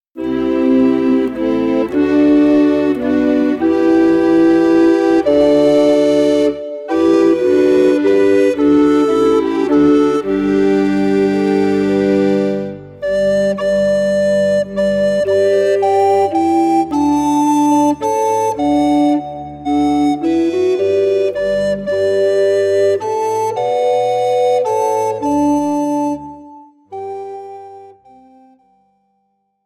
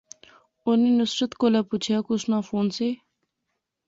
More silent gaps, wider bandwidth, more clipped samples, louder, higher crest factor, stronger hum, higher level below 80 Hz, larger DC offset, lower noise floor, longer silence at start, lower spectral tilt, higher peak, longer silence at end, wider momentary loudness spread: neither; first, 12 kHz vs 7.8 kHz; neither; first, -14 LUFS vs -24 LUFS; about the same, 10 dB vs 14 dB; neither; first, -46 dBFS vs -66 dBFS; neither; second, -65 dBFS vs -80 dBFS; second, 0.15 s vs 0.65 s; about the same, -6 dB/octave vs -5.5 dB/octave; first, -4 dBFS vs -10 dBFS; first, 1.75 s vs 0.95 s; about the same, 7 LU vs 8 LU